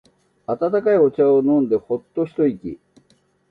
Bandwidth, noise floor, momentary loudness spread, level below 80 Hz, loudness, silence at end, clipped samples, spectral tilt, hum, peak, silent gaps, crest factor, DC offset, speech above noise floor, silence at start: 4.6 kHz; -60 dBFS; 18 LU; -60 dBFS; -19 LUFS; 0.75 s; under 0.1%; -10 dB/octave; none; -6 dBFS; none; 14 dB; under 0.1%; 42 dB; 0.5 s